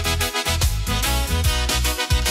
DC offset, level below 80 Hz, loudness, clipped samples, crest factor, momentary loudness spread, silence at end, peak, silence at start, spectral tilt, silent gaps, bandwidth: under 0.1%; -24 dBFS; -21 LUFS; under 0.1%; 12 dB; 1 LU; 0 s; -8 dBFS; 0 s; -3 dB/octave; none; 16.5 kHz